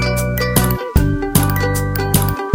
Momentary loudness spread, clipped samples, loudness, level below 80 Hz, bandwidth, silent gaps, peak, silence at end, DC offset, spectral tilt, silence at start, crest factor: 2 LU; under 0.1%; -16 LUFS; -24 dBFS; 17 kHz; none; 0 dBFS; 0 s; under 0.1%; -5 dB/octave; 0 s; 16 dB